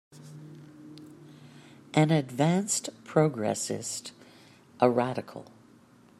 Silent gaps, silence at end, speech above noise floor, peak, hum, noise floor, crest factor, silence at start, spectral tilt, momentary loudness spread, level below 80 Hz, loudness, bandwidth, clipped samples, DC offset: none; 0.75 s; 30 dB; -8 dBFS; none; -57 dBFS; 22 dB; 0.15 s; -5 dB/octave; 24 LU; -74 dBFS; -28 LUFS; 14 kHz; under 0.1%; under 0.1%